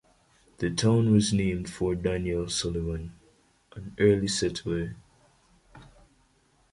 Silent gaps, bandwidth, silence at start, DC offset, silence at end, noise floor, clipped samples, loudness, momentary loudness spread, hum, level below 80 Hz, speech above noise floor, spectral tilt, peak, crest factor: none; 11.5 kHz; 0.6 s; under 0.1%; 0.9 s; -65 dBFS; under 0.1%; -27 LUFS; 15 LU; none; -46 dBFS; 39 dB; -5.5 dB/octave; -10 dBFS; 20 dB